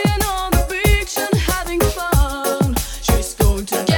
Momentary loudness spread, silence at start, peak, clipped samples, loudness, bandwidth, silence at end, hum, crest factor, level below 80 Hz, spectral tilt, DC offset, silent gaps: 3 LU; 0 s; -2 dBFS; under 0.1%; -18 LUFS; over 20 kHz; 0 s; none; 16 dB; -22 dBFS; -4.5 dB/octave; under 0.1%; none